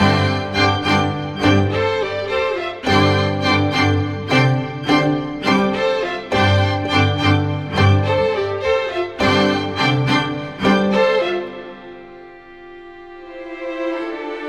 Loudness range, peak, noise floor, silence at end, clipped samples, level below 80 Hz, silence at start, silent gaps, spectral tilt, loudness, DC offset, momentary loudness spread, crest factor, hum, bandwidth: 4 LU; -2 dBFS; -39 dBFS; 0 s; under 0.1%; -46 dBFS; 0 s; none; -6 dB/octave; -17 LUFS; under 0.1%; 15 LU; 16 dB; none; 10 kHz